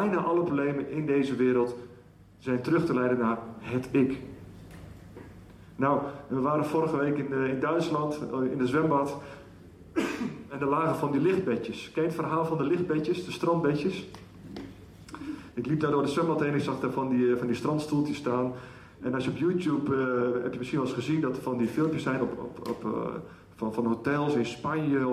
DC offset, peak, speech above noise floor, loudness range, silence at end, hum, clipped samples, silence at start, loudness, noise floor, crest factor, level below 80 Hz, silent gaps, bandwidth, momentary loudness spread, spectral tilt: under 0.1%; -14 dBFS; 22 dB; 3 LU; 0 s; none; under 0.1%; 0 s; -29 LUFS; -50 dBFS; 16 dB; -60 dBFS; none; 14 kHz; 17 LU; -7.5 dB/octave